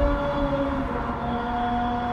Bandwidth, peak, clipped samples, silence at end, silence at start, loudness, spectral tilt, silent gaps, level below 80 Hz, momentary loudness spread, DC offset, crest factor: 8.8 kHz; -10 dBFS; under 0.1%; 0 s; 0 s; -26 LUFS; -8 dB/octave; none; -32 dBFS; 3 LU; under 0.1%; 14 dB